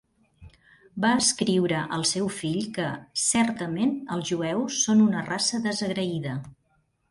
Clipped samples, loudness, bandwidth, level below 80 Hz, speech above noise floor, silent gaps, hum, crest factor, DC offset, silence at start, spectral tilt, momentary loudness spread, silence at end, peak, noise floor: under 0.1%; -25 LUFS; 11.5 kHz; -62 dBFS; 44 dB; none; none; 18 dB; under 0.1%; 0.4 s; -3.5 dB/octave; 9 LU; 0.6 s; -8 dBFS; -69 dBFS